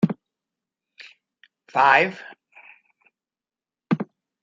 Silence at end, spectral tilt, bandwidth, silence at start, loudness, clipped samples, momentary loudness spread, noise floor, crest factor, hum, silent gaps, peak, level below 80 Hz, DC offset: 0.4 s; -6.5 dB/octave; 7.6 kHz; 0 s; -20 LUFS; under 0.1%; 22 LU; under -90 dBFS; 24 dB; none; none; -2 dBFS; -74 dBFS; under 0.1%